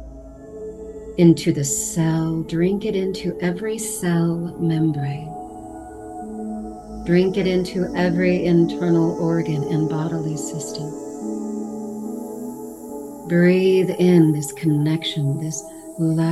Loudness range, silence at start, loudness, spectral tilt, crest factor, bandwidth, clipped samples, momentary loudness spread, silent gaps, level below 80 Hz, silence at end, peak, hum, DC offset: 6 LU; 0 s; -21 LUFS; -6 dB/octave; 18 dB; 12.5 kHz; under 0.1%; 18 LU; none; -48 dBFS; 0 s; -2 dBFS; none; under 0.1%